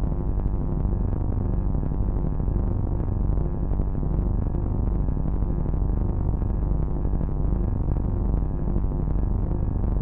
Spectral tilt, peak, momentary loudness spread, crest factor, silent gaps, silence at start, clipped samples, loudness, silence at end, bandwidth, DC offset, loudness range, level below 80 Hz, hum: -13.5 dB/octave; -10 dBFS; 1 LU; 12 dB; none; 0 s; under 0.1%; -27 LUFS; 0 s; 2.1 kHz; under 0.1%; 0 LU; -26 dBFS; none